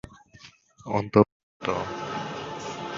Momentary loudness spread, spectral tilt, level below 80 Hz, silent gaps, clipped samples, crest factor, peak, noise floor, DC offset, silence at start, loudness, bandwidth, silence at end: 13 LU; -6.5 dB/octave; -54 dBFS; 1.32-1.60 s; under 0.1%; 24 dB; -4 dBFS; -53 dBFS; under 0.1%; 0.05 s; -27 LUFS; 7.6 kHz; 0 s